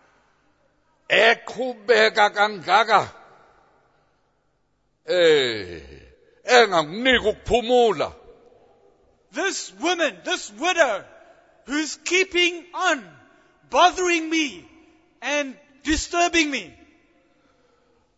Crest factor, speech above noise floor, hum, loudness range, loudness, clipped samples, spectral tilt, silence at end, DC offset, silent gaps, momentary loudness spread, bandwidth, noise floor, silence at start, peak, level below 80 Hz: 20 dB; 49 dB; 50 Hz at -70 dBFS; 5 LU; -20 LUFS; under 0.1%; -2.5 dB/octave; 1.5 s; under 0.1%; none; 13 LU; 8 kHz; -69 dBFS; 1.1 s; -2 dBFS; -48 dBFS